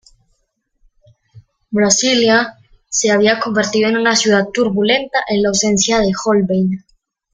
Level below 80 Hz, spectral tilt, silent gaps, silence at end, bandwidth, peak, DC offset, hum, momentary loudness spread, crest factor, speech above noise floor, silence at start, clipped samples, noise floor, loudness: -48 dBFS; -3 dB/octave; none; 0.55 s; 9.8 kHz; 0 dBFS; under 0.1%; none; 6 LU; 16 dB; 52 dB; 1.35 s; under 0.1%; -66 dBFS; -14 LUFS